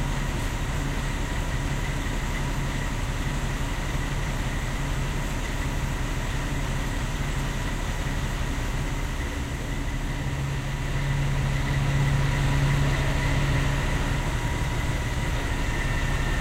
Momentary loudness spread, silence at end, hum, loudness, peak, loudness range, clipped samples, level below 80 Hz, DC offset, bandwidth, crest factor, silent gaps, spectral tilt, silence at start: 6 LU; 0 s; none; -28 LUFS; -12 dBFS; 5 LU; under 0.1%; -30 dBFS; 0.2%; 16 kHz; 14 dB; none; -5 dB/octave; 0 s